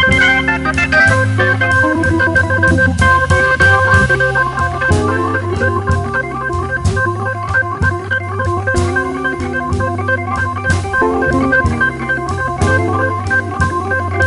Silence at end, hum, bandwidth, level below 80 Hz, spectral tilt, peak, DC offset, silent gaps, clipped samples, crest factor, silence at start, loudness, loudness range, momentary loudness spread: 0 s; none; 11.5 kHz; -28 dBFS; -6 dB/octave; 0 dBFS; under 0.1%; none; under 0.1%; 12 dB; 0 s; -13 LUFS; 5 LU; 8 LU